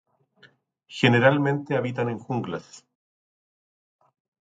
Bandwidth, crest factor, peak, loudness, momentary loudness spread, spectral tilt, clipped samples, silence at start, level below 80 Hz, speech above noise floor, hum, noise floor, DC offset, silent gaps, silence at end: 9 kHz; 22 dB; -4 dBFS; -23 LUFS; 16 LU; -6.5 dB/octave; under 0.1%; 0.9 s; -66 dBFS; 35 dB; none; -59 dBFS; under 0.1%; none; 1.75 s